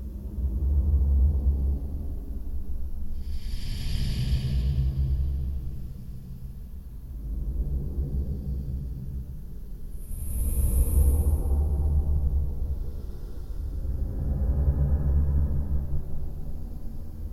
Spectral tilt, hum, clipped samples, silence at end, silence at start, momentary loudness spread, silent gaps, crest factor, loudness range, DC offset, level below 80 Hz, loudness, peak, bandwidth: -7 dB/octave; none; under 0.1%; 0 s; 0 s; 16 LU; none; 16 dB; 7 LU; under 0.1%; -28 dBFS; -29 LUFS; -10 dBFS; 14 kHz